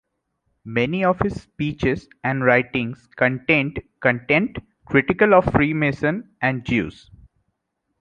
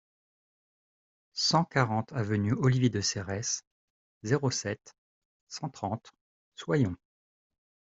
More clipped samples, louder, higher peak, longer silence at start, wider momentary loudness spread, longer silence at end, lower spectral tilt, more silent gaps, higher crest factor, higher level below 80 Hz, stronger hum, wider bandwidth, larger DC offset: neither; first, -20 LUFS vs -30 LUFS; first, -2 dBFS vs -8 dBFS; second, 0.65 s vs 1.35 s; second, 11 LU vs 15 LU; about the same, 1.1 s vs 1.05 s; first, -8 dB/octave vs -4.5 dB/octave; second, none vs 3.67-4.21 s, 4.98-5.47 s, 6.21-6.52 s; about the same, 20 dB vs 24 dB; first, -44 dBFS vs -66 dBFS; neither; first, 9.2 kHz vs 8 kHz; neither